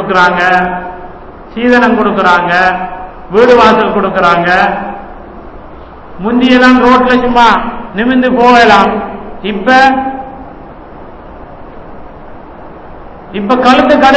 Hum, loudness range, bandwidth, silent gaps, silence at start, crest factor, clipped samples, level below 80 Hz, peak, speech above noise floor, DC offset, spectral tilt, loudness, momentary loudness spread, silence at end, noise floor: none; 7 LU; 8 kHz; none; 0 s; 10 dB; 3%; -34 dBFS; 0 dBFS; 22 dB; under 0.1%; -5.5 dB/octave; -8 LUFS; 20 LU; 0 s; -29 dBFS